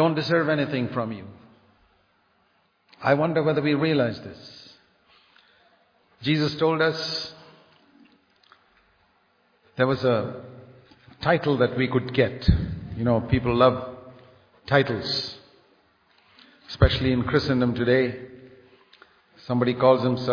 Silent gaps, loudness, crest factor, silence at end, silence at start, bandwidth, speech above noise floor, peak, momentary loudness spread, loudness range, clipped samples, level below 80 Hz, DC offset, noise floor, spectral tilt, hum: none; -23 LUFS; 22 dB; 0 s; 0 s; 5.4 kHz; 44 dB; -4 dBFS; 19 LU; 6 LU; under 0.1%; -40 dBFS; under 0.1%; -66 dBFS; -7.5 dB/octave; none